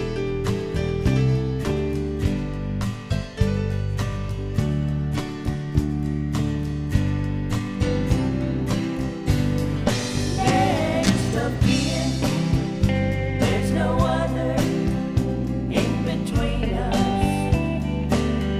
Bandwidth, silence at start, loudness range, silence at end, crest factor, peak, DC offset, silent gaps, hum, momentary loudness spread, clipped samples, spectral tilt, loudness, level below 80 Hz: 15 kHz; 0 s; 4 LU; 0 s; 18 dB; -4 dBFS; under 0.1%; none; none; 6 LU; under 0.1%; -6.5 dB/octave; -23 LUFS; -32 dBFS